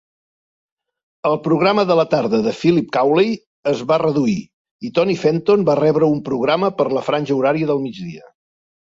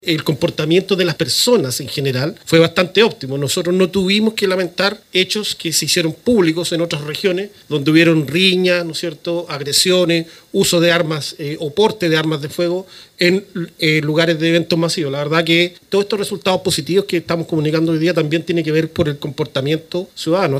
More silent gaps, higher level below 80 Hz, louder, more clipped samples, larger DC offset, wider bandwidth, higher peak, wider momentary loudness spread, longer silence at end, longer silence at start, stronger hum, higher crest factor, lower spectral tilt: first, 3.46-3.63 s, 4.53-4.65 s, 4.71-4.79 s vs none; about the same, -58 dBFS vs -54 dBFS; about the same, -17 LUFS vs -16 LUFS; neither; neither; second, 7.8 kHz vs 16 kHz; about the same, -2 dBFS vs 0 dBFS; about the same, 7 LU vs 8 LU; first, 0.8 s vs 0 s; first, 1.25 s vs 0.05 s; neither; about the same, 16 dB vs 16 dB; first, -7 dB/octave vs -4.5 dB/octave